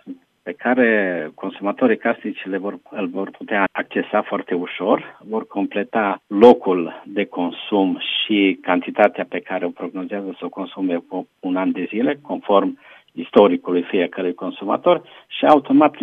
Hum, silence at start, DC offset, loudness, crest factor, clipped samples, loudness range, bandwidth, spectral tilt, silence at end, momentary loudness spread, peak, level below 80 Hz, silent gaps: none; 0.05 s; under 0.1%; -20 LUFS; 20 dB; under 0.1%; 5 LU; 5.4 kHz; -7.5 dB/octave; 0 s; 13 LU; 0 dBFS; -68 dBFS; none